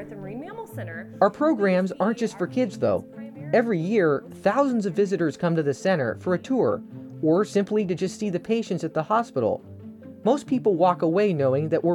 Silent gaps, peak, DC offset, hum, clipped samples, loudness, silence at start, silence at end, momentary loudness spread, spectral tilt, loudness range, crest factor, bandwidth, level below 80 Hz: none; -6 dBFS; under 0.1%; none; under 0.1%; -24 LUFS; 0 s; 0 s; 14 LU; -7 dB/octave; 2 LU; 18 dB; 13 kHz; -68 dBFS